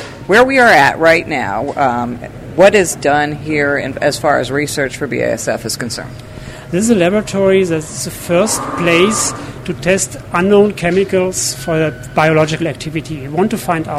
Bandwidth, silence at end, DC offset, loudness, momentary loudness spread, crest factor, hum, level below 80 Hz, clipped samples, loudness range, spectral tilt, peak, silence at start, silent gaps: 16 kHz; 0 s; under 0.1%; -14 LUFS; 13 LU; 14 dB; none; -40 dBFS; under 0.1%; 5 LU; -4.5 dB/octave; 0 dBFS; 0 s; none